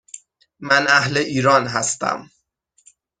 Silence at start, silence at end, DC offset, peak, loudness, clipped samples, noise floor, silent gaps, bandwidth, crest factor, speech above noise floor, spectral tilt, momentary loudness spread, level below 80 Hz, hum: 0.15 s; 0.95 s; under 0.1%; 0 dBFS; -17 LUFS; under 0.1%; -64 dBFS; none; 9.8 kHz; 20 dB; 46 dB; -3 dB/octave; 22 LU; -60 dBFS; none